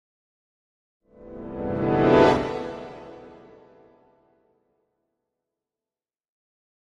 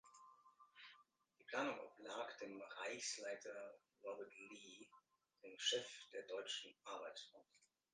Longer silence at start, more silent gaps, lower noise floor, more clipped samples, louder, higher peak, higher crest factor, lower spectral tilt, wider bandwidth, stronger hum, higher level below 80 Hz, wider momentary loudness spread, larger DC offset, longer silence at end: first, 1.2 s vs 0.05 s; neither; first, under -90 dBFS vs -76 dBFS; neither; first, -22 LUFS vs -49 LUFS; first, -4 dBFS vs -28 dBFS; about the same, 24 dB vs 24 dB; first, -7.5 dB/octave vs -1 dB/octave; about the same, 10 kHz vs 9.6 kHz; neither; first, -50 dBFS vs under -90 dBFS; first, 27 LU vs 21 LU; neither; first, 3.7 s vs 0.3 s